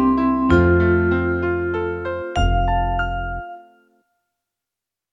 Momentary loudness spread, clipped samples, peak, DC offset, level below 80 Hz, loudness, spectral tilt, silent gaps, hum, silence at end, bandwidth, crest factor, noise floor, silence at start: 11 LU; under 0.1%; -4 dBFS; under 0.1%; -28 dBFS; -19 LUFS; -8.5 dB/octave; none; none; 1.5 s; 7.6 kHz; 16 dB; -86 dBFS; 0 s